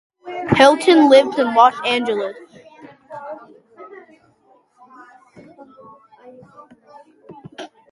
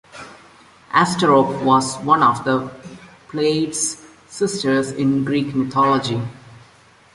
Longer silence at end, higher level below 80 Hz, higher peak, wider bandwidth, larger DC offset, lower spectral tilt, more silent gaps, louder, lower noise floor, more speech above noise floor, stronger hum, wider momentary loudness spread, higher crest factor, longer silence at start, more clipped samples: second, 0.25 s vs 0.55 s; about the same, -54 dBFS vs -56 dBFS; about the same, 0 dBFS vs -2 dBFS; about the same, 11.5 kHz vs 11.5 kHz; neither; about the same, -5 dB/octave vs -4.5 dB/octave; neither; first, -14 LUFS vs -18 LUFS; first, -56 dBFS vs -50 dBFS; first, 42 dB vs 32 dB; neither; first, 26 LU vs 19 LU; about the same, 20 dB vs 18 dB; about the same, 0.25 s vs 0.15 s; neither